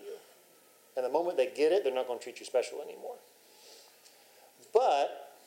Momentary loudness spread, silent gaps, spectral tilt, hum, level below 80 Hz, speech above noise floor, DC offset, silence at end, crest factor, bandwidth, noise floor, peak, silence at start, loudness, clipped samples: 21 LU; none; -2.5 dB/octave; none; under -90 dBFS; 31 dB; under 0.1%; 0.2 s; 20 dB; 16 kHz; -61 dBFS; -12 dBFS; 0 s; -31 LUFS; under 0.1%